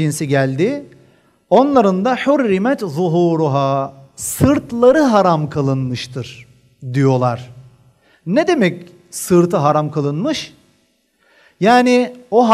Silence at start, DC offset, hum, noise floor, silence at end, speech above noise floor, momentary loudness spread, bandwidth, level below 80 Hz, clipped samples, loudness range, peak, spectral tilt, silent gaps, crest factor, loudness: 0 s; under 0.1%; none; -60 dBFS; 0 s; 46 dB; 15 LU; 15.5 kHz; -50 dBFS; under 0.1%; 4 LU; 0 dBFS; -6 dB/octave; none; 16 dB; -15 LUFS